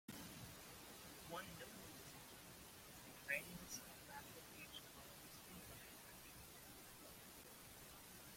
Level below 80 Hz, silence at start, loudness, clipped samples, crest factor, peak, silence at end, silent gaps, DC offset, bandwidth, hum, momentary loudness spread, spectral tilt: -74 dBFS; 0.1 s; -55 LUFS; under 0.1%; 26 dB; -30 dBFS; 0 s; none; under 0.1%; 16.5 kHz; none; 6 LU; -2.5 dB/octave